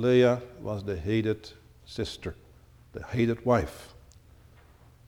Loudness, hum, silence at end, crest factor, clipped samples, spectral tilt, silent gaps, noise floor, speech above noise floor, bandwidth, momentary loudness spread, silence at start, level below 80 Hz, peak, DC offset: -29 LUFS; none; 1.2 s; 18 dB; under 0.1%; -7 dB/octave; none; -55 dBFS; 28 dB; 17 kHz; 21 LU; 0 s; -50 dBFS; -10 dBFS; under 0.1%